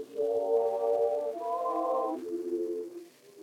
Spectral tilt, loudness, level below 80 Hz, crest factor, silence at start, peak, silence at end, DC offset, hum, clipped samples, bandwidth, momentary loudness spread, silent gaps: -5.5 dB/octave; -31 LUFS; under -90 dBFS; 14 dB; 0 s; -16 dBFS; 0 s; under 0.1%; none; under 0.1%; 15.5 kHz; 8 LU; none